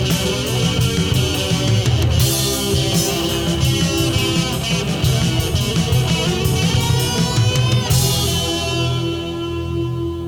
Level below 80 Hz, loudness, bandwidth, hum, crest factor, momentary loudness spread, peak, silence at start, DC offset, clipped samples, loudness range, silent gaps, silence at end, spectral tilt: -30 dBFS; -17 LUFS; 18 kHz; none; 12 dB; 4 LU; -4 dBFS; 0 s; under 0.1%; under 0.1%; 1 LU; none; 0 s; -4.5 dB/octave